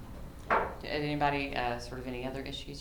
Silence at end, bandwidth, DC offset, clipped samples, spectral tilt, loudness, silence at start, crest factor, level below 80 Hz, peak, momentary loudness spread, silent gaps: 0 s; over 20 kHz; under 0.1%; under 0.1%; -5.5 dB/octave; -34 LUFS; 0 s; 20 dB; -48 dBFS; -14 dBFS; 10 LU; none